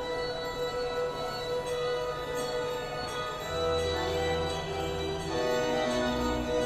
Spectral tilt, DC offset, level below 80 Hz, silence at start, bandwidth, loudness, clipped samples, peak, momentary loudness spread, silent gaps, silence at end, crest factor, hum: -4.5 dB/octave; under 0.1%; -46 dBFS; 0 s; 14.5 kHz; -31 LUFS; under 0.1%; -18 dBFS; 5 LU; none; 0 s; 14 dB; none